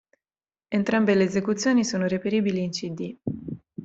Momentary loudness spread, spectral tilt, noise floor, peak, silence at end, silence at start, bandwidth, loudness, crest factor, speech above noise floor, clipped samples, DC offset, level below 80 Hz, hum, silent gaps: 12 LU; -5.5 dB/octave; under -90 dBFS; -8 dBFS; 0 s; 0.7 s; 8.2 kHz; -25 LUFS; 16 dB; over 67 dB; under 0.1%; under 0.1%; -62 dBFS; none; none